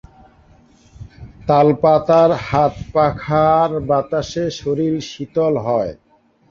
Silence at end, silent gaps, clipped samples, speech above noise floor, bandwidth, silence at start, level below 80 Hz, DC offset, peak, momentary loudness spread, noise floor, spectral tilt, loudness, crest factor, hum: 0.55 s; none; under 0.1%; 34 dB; 7.4 kHz; 1 s; -44 dBFS; under 0.1%; -2 dBFS; 10 LU; -50 dBFS; -7 dB/octave; -17 LUFS; 16 dB; none